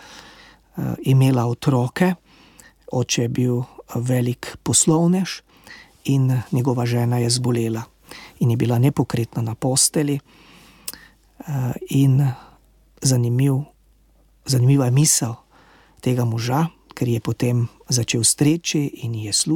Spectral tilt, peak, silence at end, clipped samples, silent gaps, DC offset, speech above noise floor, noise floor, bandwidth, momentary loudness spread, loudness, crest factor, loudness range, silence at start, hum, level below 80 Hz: -5 dB/octave; -4 dBFS; 0 s; under 0.1%; none; under 0.1%; 37 dB; -56 dBFS; 17.5 kHz; 14 LU; -20 LUFS; 16 dB; 2 LU; 0.1 s; none; -54 dBFS